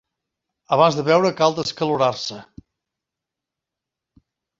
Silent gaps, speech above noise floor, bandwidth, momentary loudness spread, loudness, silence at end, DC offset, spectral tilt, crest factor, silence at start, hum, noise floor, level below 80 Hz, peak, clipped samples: none; 67 dB; 7.8 kHz; 13 LU; -19 LUFS; 2.15 s; under 0.1%; -5 dB/octave; 22 dB; 0.7 s; none; -85 dBFS; -62 dBFS; -2 dBFS; under 0.1%